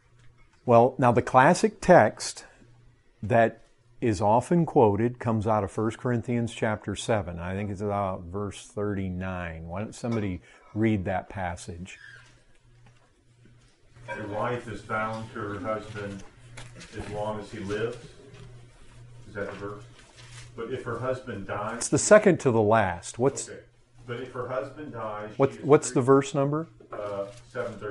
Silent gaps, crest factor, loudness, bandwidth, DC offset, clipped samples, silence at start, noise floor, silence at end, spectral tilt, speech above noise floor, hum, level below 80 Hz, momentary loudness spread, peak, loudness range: none; 22 dB; -26 LUFS; 11.5 kHz; under 0.1%; under 0.1%; 0.25 s; -59 dBFS; 0 s; -6 dB/octave; 34 dB; none; -54 dBFS; 19 LU; -4 dBFS; 13 LU